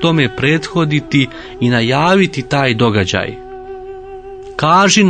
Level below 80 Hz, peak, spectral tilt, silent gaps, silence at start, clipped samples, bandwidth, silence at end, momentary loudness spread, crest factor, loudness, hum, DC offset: -42 dBFS; 0 dBFS; -5 dB/octave; none; 0 s; under 0.1%; 9.4 kHz; 0 s; 19 LU; 14 dB; -14 LUFS; none; under 0.1%